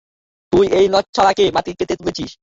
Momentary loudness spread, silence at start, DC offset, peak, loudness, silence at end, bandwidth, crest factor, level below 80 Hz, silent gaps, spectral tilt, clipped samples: 9 LU; 0.5 s; under 0.1%; -2 dBFS; -16 LUFS; 0.1 s; 7.8 kHz; 16 dB; -44 dBFS; 1.09-1.13 s; -5 dB/octave; under 0.1%